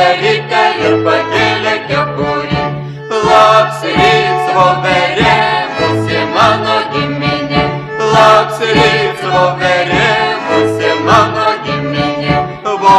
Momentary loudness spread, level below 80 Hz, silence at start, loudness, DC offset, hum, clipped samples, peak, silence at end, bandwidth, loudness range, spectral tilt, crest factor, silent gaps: 7 LU; -38 dBFS; 0 s; -11 LUFS; under 0.1%; none; 0.3%; 0 dBFS; 0 s; 13 kHz; 2 LU; -5 dB/octave; 10 dB; none